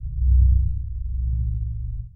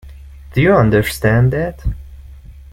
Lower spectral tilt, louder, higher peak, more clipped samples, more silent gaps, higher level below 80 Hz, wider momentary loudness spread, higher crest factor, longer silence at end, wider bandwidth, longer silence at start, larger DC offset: first, -15 dB/octave vs -7 dB/octave; second, -24 LUFS vs -15 LUFS; second, -8 dBFS vs -2 dBFS; neither; neither; first, -22 dBFS vs -30 dBFS; about the same, 12 LU vs 14 LU; about the same, 14 dB vs 14 dB; about the same, 0.05 s vs 0.1 s; second, 0.2 kHz vs 16.5 kHz; about the same, 0 s vs 0.05 s; neither